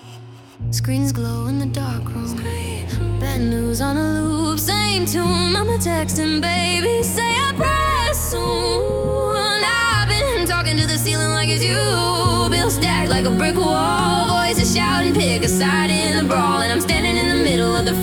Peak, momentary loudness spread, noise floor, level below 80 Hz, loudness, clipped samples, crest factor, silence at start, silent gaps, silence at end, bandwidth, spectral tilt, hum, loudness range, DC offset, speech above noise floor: -4 dBFS; 6 LU; -39 dBFS; -32 dBFS; -18 LUFS; under 0.1%; 14 dB; 0 s; none; 0 s; 18 kHz; -4 dB/octave; none; 5 LU; under 0.1%; 21 dB